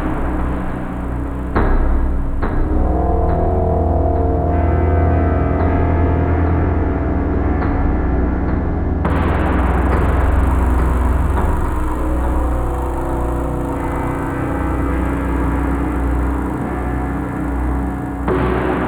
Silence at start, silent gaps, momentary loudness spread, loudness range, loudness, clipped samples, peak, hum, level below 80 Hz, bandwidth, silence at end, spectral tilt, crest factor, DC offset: 0 s; none; 5 LU; 4 LU; -18 LUFS; under 0.1%; -2 dBFS; none; -20 dBFS; 11 kHz; 0 s; -9 dB/octave; 14 dB; under 0.1%